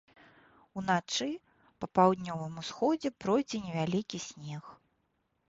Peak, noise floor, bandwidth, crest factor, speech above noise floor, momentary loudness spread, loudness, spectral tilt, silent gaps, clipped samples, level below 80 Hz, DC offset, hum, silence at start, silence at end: -10 dBFS; -77 dBFS; 8 kHz; 24 dB; 46 dB; 17 LU; -32 LUFS; -5 dB/octave; none; under 0.1%; -68 dBFS; under 0.1%; none; 0.75 s; 0.75 s